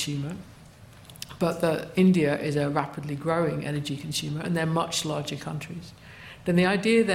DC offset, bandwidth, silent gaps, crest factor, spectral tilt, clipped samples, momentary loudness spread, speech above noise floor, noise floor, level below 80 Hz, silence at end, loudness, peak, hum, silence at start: under 0.1%; 16 kHz; none; 18 dB; -5.5 dB/octave; under 0.1%; 19 LU; 23 dB; -49 dBFS; -58 dBFS; 0 s; -26 LUFS; -8 dBFS; none; 0 s